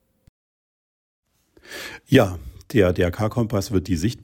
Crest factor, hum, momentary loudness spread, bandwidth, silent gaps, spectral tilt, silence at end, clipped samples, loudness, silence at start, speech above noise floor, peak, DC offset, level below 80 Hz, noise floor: 20 dB; none; 17 LU; 17 kHz; none; -6.5 dB/octave; 0.05 s; under 0.1%; -21 LUFS; 1.7 s; over 69 dB; -2 dBFS; under 0.1%; -46 dBFS; under -90 dBFS